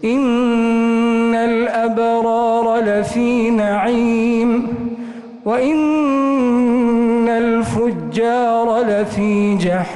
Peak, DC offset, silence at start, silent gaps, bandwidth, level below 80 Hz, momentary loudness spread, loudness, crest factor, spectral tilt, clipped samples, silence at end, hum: -8 dBFS; under 0.1%; 0 s; none; 11 kHz; -48 dBFS; 4 LU; -16 LUFS; 8 dB; -6.5 dB/octave; under 0.1%; 0 s; none